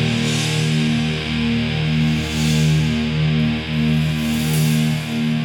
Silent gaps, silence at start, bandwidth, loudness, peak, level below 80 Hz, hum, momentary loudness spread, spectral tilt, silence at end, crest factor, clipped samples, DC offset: none; 0 s; 19 kHz; -19 LUFS; -6 dBFS; -36 dBFS; none; 3 LU; -5.5 dB/octave; 0 s; 12 dB; under 0.1%; under 0.1%